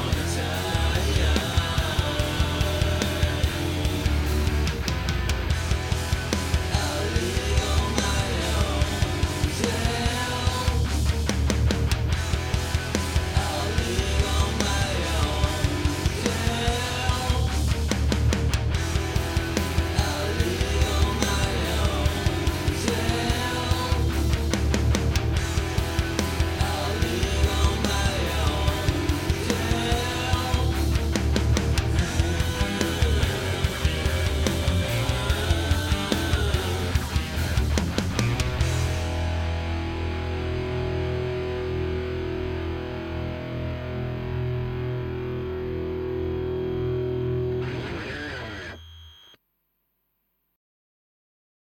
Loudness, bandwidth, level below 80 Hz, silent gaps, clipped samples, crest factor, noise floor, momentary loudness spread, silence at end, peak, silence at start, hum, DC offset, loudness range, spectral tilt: -25 LUFS; 17 kHz; -30 dBFS; none; under 0.1%; 20 dB; -74 dBFS; 6 LU; 2.55 s; -6 dBFS; 0 s; none; under 0.1%; 5 LU; -5 dB/octave